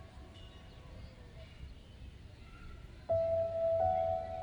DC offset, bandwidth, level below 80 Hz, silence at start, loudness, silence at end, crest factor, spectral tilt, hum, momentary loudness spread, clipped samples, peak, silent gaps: under 0.1%; 8.2 kHz; -54 dBFS; 0 s; -34 LUFS; 0 s; 16 dB; -7.5 dB/octave; none; 22 LU; under 0.1%; -22 dBFS; none